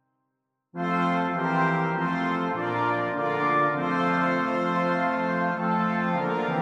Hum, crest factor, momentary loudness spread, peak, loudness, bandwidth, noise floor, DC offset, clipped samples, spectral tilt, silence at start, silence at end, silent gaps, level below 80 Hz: none; 14 dB; 3 LU; -12 dBFS; -25 LUFS; 8.2 kHz; -79 dBFS; under 0.1%; under 0.1%; -7.5 dB/octave; 0.75 s; 0 s; none; -68 dBFS